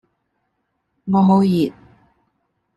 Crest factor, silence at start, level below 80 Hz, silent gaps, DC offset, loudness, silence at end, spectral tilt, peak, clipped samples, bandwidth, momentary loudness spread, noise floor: 18 dB; 1.05 s; -56 dBFS; none; under 0.1%; -17 LUFS; 1.05 s; -9 dB/octave; -4 dBFS; under 0.1%; 12 kHz; 11 LU; -72 dBFS